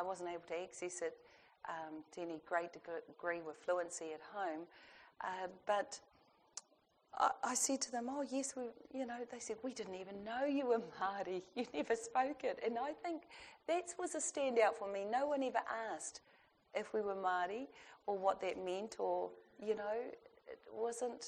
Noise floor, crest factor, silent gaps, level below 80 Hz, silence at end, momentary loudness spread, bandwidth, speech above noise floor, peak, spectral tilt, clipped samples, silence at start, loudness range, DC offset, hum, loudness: -75 dBFS; 22 dB; none; -82 dBFS; 0 s; 13 LU; 10 kHz; 34 dB; -20 dBFS; -2.5 dB/octave; under 0.1%; 0 s; 5 LU; under 0.1%; none; -41 LUFS